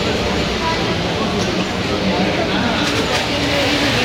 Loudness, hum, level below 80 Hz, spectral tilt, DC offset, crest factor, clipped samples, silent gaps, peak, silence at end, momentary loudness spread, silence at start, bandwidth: -17 LUFS; none; -34 dBFS; -4.5 dB/octave; under 0.1%; 12 dB; under 0.1%; none; -4 dBFS; 0 s; 3 LU; 0 s; 16 kHz